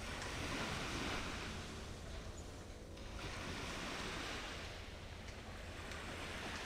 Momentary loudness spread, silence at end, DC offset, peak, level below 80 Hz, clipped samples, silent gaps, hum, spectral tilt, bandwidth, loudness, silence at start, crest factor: 9 LU; 0 s; under 0.1%; -30 dBFS; -54 dBFS; under 0.1%; none; none; -3.5 dB/octave; 16 kHz; -46 LUFS; 0 s; 16 dB